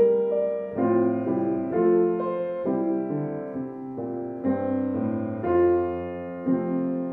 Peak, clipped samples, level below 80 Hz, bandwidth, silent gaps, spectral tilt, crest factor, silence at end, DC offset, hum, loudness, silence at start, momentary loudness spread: -10 dBFS; under 0.1%; -60 dBFS; 3.4 kHz; none; -12 dB/octave; 14 dB; 0 s; under 0.1%; none; -26 LUFS; 0 s; 11 LU